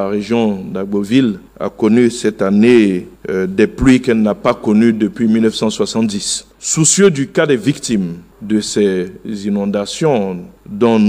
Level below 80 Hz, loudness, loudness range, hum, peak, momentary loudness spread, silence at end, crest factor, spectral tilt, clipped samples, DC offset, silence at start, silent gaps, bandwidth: -40 dBFS; -14 LUFS; 4 LU; none; 0 dBFS; 11 LU; 0 s; 14 dB; -5 dB/octave; under 0.1%; under 0.1%; 0 s; none; 15 kHz